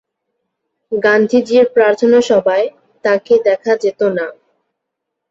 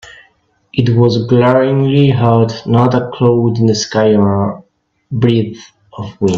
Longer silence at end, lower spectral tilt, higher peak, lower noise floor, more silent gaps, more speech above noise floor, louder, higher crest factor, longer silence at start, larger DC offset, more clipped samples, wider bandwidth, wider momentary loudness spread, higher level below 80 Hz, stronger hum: first, 1 s vs 0 s; second, -5 dB/octave vs -7 dB/octave; about the same, -2 dBFS vs 0 dBFS; first, -77 dBFS vs -56 dBFS; neither; first, 64 dB vs 44 dB; about the same, -13 LUFS vs -12 LUFS; about the same, 14 dB vs 12 dB; first, 0.9 s vs 0.05 s; neither; neither; about the same, 7.8 kHz vs 7.6 kHz; about the same, 11 LU vs 11 LU; second, -60 dBFS vs -48 dBFS; neither